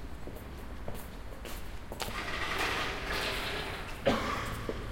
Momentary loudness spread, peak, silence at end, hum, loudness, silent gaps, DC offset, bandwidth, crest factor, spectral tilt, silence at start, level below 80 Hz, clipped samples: 14 LU; -14 dBFS; 0 s; none; -36 LUFS; none; under 0.1%; 16.5 kHz; 22 dB; -4 dB/octave; 0 s; -44 dBFS; under 0.1%